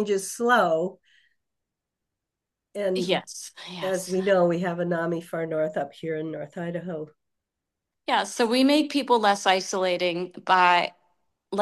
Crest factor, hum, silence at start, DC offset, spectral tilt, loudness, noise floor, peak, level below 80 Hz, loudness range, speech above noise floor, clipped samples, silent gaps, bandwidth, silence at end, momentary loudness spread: 20 dB; none; 0 s; under 0.1%; -4 dB/octave; -24 LUFS; -86 dBFS; -6 dBFS; -76 dBFS; 8 LU; 62 dB; under 0.1%; none; 12.5 kHz; 0 s; 13 LU